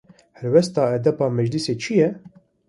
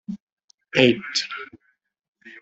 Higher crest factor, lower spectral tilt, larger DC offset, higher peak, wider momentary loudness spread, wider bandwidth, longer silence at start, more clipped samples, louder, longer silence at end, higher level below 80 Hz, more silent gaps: second, 18 dB vs 24 dB; first, -6.5 dB/octave vs -4 dB/octave; neither; about the same, -2 dBFS vs -2 dBFS; second, 6 LU vs 21 LU; first, 11.5 kHz vs 8.2 kHz; first, 0.4 s vs 0.1 s; neither; about the same, -20 LUFS vs -21 LUFS; first, 0.4 s vs 0 s; about the same, -62 dBFS vs -66 dBFS; second, none vs 0.22-0.37 s, 0.44-0.48 s, 0.54-0.58 s, 2.08-2.13 s